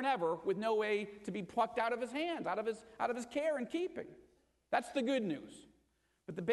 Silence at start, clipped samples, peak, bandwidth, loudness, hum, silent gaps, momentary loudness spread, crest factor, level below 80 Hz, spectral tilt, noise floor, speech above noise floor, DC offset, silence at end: 0 s; under 0.1%; -20 dBFS; 12 kHz; -37 LUFS; none; none; 10 LU; 18 dB; -76 dBFS; -5 dB/octave; -77 dBFS; 40 dB; under 0.1%; 0 s